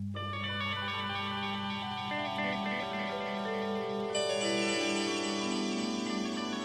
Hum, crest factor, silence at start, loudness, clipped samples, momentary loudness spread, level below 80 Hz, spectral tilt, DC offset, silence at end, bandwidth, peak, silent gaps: none; 14 dB; 0 s; -33 LUFS; under 0.1%; 5 LU; -70 dBFS; -4 dB/octave; under 0.1%; 0 s; 13 kHz; -20 dBFS; none